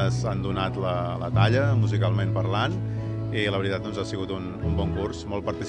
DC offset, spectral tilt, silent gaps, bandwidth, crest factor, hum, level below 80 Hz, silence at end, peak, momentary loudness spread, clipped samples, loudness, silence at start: under 0.1%; -7 dB/octave; none; 9 kHz; 18 dB; none; -44 dBFS; 0 s; -6 dBFS; 8 LU; under 0.1%; -26 LUFS; 0 s